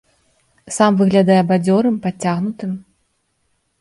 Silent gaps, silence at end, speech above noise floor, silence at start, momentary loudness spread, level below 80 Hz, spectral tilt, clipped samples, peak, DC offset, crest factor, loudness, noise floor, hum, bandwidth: none; 1 s; 51 dB; 0.65 s; 14 LU; -60 dBFS; -6.5 dB/octave; under 0.1%; 0 dBFS; under 0.1%; 18 dB; -16 LUFS; -66 dBFS; none; 11.5 kHz